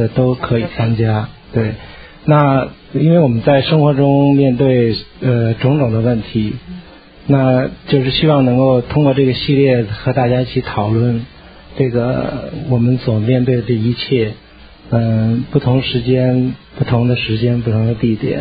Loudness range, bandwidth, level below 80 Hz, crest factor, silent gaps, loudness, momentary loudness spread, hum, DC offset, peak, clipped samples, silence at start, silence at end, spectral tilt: 4 LU; 5 kHz; -40 dBFS; 14 dB; none; -14 LUFS; 9 LU; none; under 0.1%; 0 dBFS; under 0.1%; 0 s; 0 s; -11 dB/octave